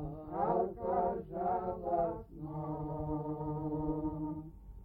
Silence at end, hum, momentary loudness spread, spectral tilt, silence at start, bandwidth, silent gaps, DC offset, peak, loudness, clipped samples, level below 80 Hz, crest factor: 0 s; none; 8 LU; -12 dB/octave; 0 s; 3.8 kHz; none; under 0.1%; -20 dBFS; -37 LUFS; under 0.1%; -52 dBFS; 16 dB